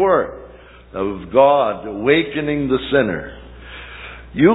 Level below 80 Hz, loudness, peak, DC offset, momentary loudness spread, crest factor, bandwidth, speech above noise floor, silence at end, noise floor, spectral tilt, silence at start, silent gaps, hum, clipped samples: -42 dBFS; -18 LUFS; 0 dBFS; under 0.1%; 21 LU; 18 dB; 4.1 kHz; 19 dB; 0 s; -36 dBFS; -10 dB/octave; 0 s; none; none; under 0.1%